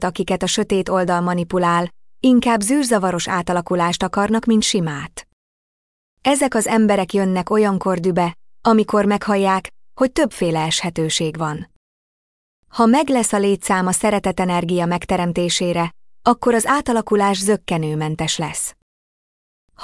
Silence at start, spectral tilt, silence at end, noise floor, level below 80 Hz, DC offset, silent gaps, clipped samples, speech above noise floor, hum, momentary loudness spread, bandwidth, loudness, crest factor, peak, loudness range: 0 s; -4.5 dB/octave; 0 s; under -90 dBFS; -48 dBFS; under 0.1%; 5.33-6.17 s, 11.76-12.63 s, 18.82-19.68 s; under 0.1%; over 72 dB; none; 7 LU; 12 kHz; -18 LUFS; 16 dB; -2 dBFS; 3 LU